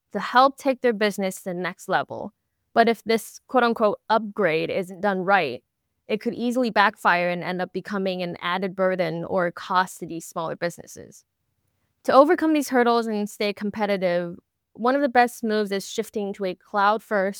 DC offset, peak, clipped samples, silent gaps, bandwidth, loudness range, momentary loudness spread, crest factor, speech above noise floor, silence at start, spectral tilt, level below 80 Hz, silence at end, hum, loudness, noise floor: under 0.1%; -2 dBFS; under 0.1%; none; 19.5 kHz; 4 LU; 11 LU; 22 dB; 50 dB; 0.15 s; -5 dB/octave; -70 dBFS; 0 s; none; -23 LUFS; -73 dBFS